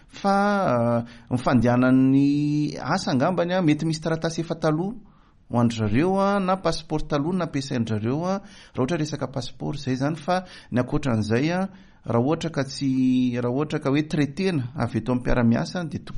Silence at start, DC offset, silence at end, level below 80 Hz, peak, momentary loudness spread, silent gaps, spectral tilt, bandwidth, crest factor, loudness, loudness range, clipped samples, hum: 0.15 s; under 0.1%; 0 s; -42 dBFS; -6 dBFS; 8 LU; none; -7 dB/octave; 11 kHz; 16 dB; -24 LUFS; 5 LU; under 0.1%; none